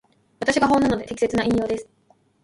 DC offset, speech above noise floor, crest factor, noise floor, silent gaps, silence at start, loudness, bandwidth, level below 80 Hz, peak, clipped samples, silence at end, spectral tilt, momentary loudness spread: under 0.1%; 40 dB; 18 dB; -61 dBFS; none; 0.4 s; -22 LUFS; 11.5 kHz; -48 dBFS; -6 dBFS; under 0.1%; 0.6 s; -5 dB/octave; 8 LU